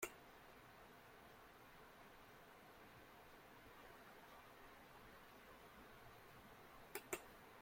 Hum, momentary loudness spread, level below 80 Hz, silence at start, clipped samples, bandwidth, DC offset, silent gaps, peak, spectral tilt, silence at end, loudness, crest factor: none; 11 LU; -76 dBFS; 0 s; under 0.1%; 16.5 kHz; under 0.1%; none; -30 dBFS; -3 dB/octave; 0 s; -60 LUFS; 30 dB